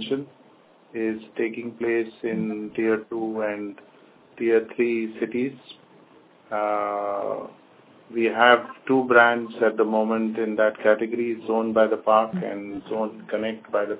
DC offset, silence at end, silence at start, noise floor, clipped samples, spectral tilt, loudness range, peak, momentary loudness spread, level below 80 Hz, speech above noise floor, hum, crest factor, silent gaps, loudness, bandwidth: under 0.1%; 0 s; 0 s; -55 dBFS; under 0.1%; -9 dB/octave; 7 LU; -2 dBFS; 13 LU; -70 dBFS; 31 dB; none; 22 dB; none; -24 LUFS; 4 kHz